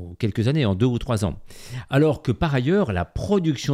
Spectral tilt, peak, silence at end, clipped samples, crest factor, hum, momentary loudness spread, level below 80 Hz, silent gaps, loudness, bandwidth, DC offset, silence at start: -7 dB/octave; -6 dBFS; 0 s; under 0.1%; 16 dB; none; 8 LU; -40 dBFS; none; -22 LUFS; 14.5 kHz; under 0.1%; 0 s